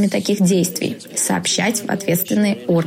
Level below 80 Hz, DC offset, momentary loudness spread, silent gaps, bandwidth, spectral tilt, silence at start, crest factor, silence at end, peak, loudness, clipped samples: -62 dBFS; under 0.1%; 5 LU; none; 16.5 kHz; -4.5 dB/octave; 0 s; 12 dB; 0 s; -6 dBFS; -18 LUFS; under 0.1%